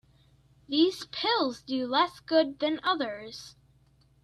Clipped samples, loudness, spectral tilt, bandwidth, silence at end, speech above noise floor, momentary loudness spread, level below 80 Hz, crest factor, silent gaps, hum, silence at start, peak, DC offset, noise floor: under 0.1%; -28 LUFS; -3.5 dB/octave; 13 kHz; 0.75 s; 35 dB; 15 LU; -68 dBFS; 18 dB; none; 60 Hz at -60 dBFS; 0.7 s; -12 dBFS; under 0.1%; -63 dBFS